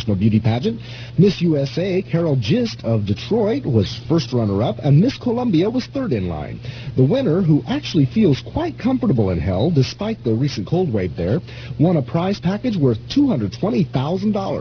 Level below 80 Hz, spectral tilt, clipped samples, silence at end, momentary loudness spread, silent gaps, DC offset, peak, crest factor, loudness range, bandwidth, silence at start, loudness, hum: -42 dBFS; -8 dB/octave; under 0.1%; 0 s; 6 LU; none; under 0.1%; -4 dBFS; 14 dB; 1 LU; 5.4 kHz; 0 s; -19 LUFS; none